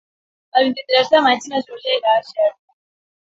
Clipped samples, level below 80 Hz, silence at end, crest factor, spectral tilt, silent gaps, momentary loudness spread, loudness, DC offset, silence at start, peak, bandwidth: under 0.1%; -68 dBFS; 0.7 s; 18 dB; -2.5 dB/octave; none; 7 LU; -17 LUFS; under 0.1%; 0.55 s; -2 dBFS; 7.8 kHz